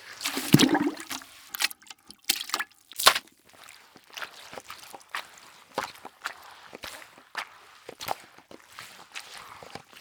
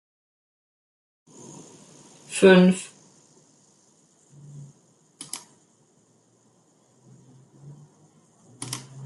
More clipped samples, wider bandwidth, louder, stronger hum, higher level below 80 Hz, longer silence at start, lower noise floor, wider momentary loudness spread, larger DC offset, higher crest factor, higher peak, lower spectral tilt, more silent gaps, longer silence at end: neither; first, over 20 kHz vs 12 kHz; second, -28 LUFS vs -21 LUFS; neither; first, -66 dBFS vs -72 dBFS; second, 0 s vs 2.3 s; second, -53 dBFS vs -62 dBFS; second, 26 LU vs 30 LU; neither; first, 32 dB vs 24 dB; first, 0 dBFS vs -4 dBFS; second, -3 dB/octave vs -5.5 dB/octave; neither; about the same, 0 s vs 0 s